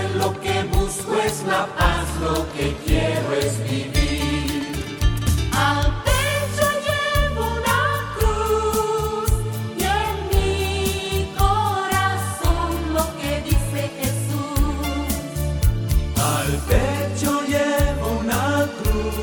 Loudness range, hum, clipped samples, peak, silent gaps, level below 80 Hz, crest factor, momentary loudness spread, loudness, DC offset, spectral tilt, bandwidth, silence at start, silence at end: 2 LU; none; under 0.1%; -2 dBFS; none; -26 dBFS; 18 dB; 4 LU; -21 LUFS; under 0.1%; -4.5 dB/octave; over 20 kHz; 0 s; 0 s